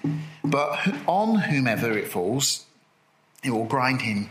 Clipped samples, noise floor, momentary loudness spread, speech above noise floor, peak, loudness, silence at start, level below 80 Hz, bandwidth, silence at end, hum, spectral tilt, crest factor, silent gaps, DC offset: under 0.1%; -63 dBFS; 7 LU; 39 dB; -8 dBFS; -24 LUFS; 0.05 s; -68 dBFS; 16 kHz; 0 s; none; -4.5 dB/octave; 18 dB; none; under 0.1%